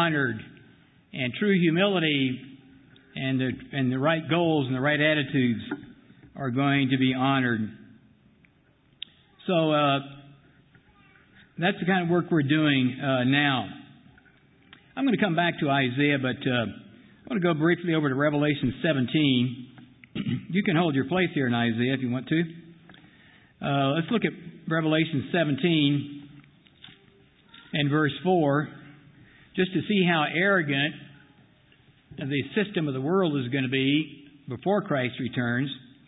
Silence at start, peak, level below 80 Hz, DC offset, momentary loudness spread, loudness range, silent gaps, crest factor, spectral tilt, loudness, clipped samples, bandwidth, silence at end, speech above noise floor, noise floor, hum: 0 s; -10 dBFS; -62 dBFS; under 0.1%; 14 LU; 3 LU; none; 18 dB; -10.5 dB/octave; -25 LUFS; under 0.1%; 4 kHz; 0.3 s; 37 dB; -62 dBFS; none